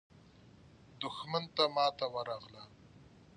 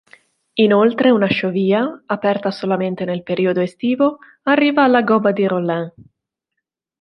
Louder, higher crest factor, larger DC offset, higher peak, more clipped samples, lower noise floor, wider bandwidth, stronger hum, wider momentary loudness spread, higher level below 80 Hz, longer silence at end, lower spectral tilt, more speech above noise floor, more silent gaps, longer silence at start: second, -35 LUFS vs -17 LUFS; first, 24 dB vs 16 dB; neither; second, -14 dBFS vs 0 dBFS; neither; second, -60 dBFS vs -79 dBFS; about the same, 10 kHz vs 9.2 kHz; neither; first, 23 LU vs 9 LU; second, -72 dBFS vs -62 dBFS; second, 0.35 s vs 1.1 s; second, -4.5 dB/octave vs -8 dB/octave; second, 24 dB vs 63 dB; neither; about the same, 0.65 s vs 0.55 s